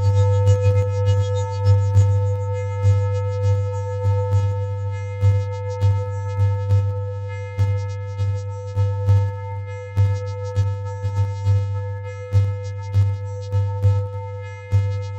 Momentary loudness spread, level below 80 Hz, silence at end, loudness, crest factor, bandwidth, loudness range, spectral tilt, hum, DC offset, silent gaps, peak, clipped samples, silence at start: 10 LU; -46 dBFS; 0 s; -21 LUFS; 14 dB; 7.8 kHz; 4 LU; -7.5 dB/octave; none; under 0.1%; none; -6 dBFS; under 0.1%; 0 s